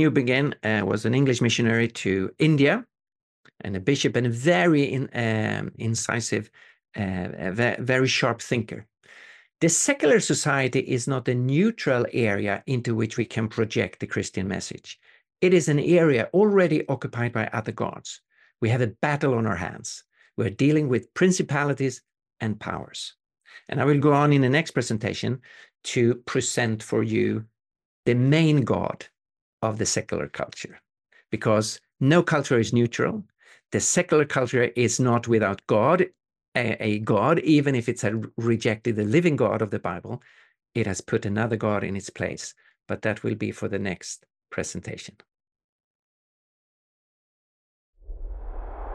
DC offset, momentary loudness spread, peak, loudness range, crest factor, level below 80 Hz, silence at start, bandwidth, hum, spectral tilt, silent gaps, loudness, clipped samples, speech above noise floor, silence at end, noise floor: under 0.1%; 15 LU; -6 dBFS; 6 LU; 18 dB; -52 dBFS; 0 s; 12.5 kHz; none; -5 dB/octave; 3.22-3.44 s, 27.85-28.03 s, 29.41-29.58 s, 36.48-36.52 s, 45.64-47.93 s; -24 LUFS; under 0.1%; 27 dB; 0 s; -50 dBFS